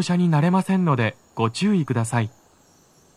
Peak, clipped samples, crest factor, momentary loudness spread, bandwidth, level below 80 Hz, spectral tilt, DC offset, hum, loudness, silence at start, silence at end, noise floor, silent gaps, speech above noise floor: -6 dBFS; under 0.1%; 16 dB; 7 LU; 12.5 kHz; -66 dBFS; -6.5 dB/octave; under 0.1%; none; -22 LUFS; 0 s; 0.85 s; -56 dBFS; none; 36 dB